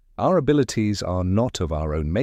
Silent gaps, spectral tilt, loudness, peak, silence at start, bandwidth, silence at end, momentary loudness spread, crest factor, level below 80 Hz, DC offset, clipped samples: none; -6.5 dB/octave; -22 LUFS; -8 dBFS; 0.2 s; 14 kHz; 0 s; 6 LU; 14 dB; -36 dBFS; under 0.1%; under 0.1%